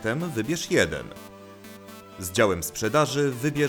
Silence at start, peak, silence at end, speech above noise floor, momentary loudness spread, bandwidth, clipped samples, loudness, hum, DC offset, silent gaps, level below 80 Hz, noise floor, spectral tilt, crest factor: 0 s; -8 dBFS; 0 s; 20 dB; 21 LU; over 20 kHz; under 0.1%; -25 LUFS; none; under 0.1%; none; -54 dBFS; -44 dBFS; -4.5 dB/octave; 18 dB